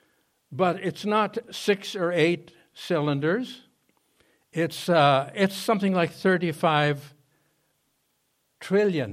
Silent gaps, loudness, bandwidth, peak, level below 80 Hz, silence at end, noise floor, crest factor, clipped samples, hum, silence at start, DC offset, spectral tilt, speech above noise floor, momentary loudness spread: none; -25 LUFS; 15.5 kHz; -6 dBFS; -72 dBFS; 0 s; -72 dBFS; 20 dB; under 0.1%; none; 0.5 s; under 0.1%; -6 dB/octave; 48 dB; 12 LU